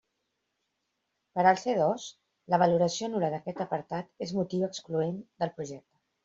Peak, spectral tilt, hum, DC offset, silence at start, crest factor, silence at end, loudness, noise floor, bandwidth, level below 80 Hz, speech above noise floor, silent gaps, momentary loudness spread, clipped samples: -8 dBFS; -5.5 dB/octave; none; under 0.1%; 1.35 s; 22 dB; 0.45 s; -29 LUFS; -81 dBFS; 7.8 kHz; -72 dBFS; 52 dB; none; 13 LU; under 0.1%